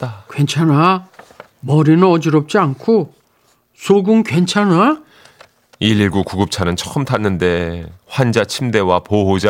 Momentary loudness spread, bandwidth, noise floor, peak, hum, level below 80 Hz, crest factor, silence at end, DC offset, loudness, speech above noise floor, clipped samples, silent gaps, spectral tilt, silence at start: 9 LU; 16 kHz; -57 dBFS; 0 dBFS; none; -46 dBFS; 14 dB; 0 s; under 0.1%; -15 LUFS; 43 dB; under 0.1%; none; -6 dB/octave; 0 s